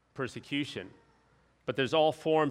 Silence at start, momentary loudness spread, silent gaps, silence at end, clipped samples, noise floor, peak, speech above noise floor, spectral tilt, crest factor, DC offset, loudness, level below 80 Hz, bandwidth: 0.15 s; 15 LU; none; 0 s; under 0.1%; -67 dBFS; -14 dBFS; 37 dB; -5.5 dB/octave; 18 dB; under 0.1%; -31 LUFS; -70 dBFS; 12.5 kHz